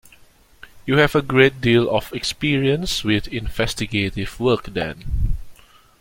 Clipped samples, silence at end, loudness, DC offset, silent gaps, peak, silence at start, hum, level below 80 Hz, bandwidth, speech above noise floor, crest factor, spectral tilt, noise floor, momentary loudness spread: under 0.1%; 0.45 s; -20 LUFS; under 0.1%; none; -2 dBFS; 0.75 s; none; -32 dBFS; 17 kHz; 31 dB; 18 dB; -5.5 dB/octave; -50 dBFS; 11 LU